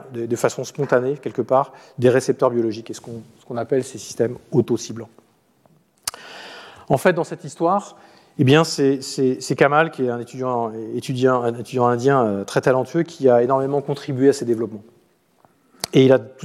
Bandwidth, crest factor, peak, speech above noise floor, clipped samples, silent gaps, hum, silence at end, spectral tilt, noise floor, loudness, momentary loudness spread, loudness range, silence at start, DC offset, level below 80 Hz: 15 kHz; 18 dB; -2 dBFS; 39 dB; under 0.1%; none; none; 0 s; -6 dB/octave; -58 dBFS; -20 LUFS; 15 LU; 7 LU; 0 s; under 0.1%; -64 dBFS